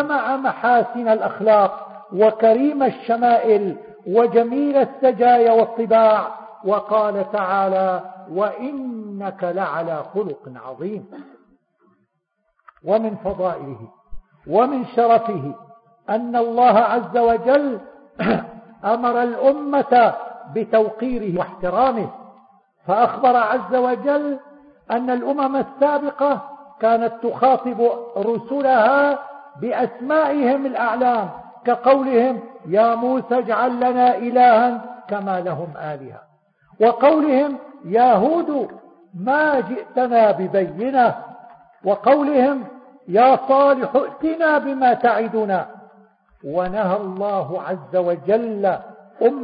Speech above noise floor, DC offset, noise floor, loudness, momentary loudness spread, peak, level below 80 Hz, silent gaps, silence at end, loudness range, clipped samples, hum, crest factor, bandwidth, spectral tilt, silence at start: 53 dB; under 0.1%; -71 dBFS; -18 LUFS; 14 LU; -2 dBFS; -58 dBFS; none; 0 s; 6 LU; under 0.1%; none; 16 dB; 5 kHz; -11 dB/octave; 0 s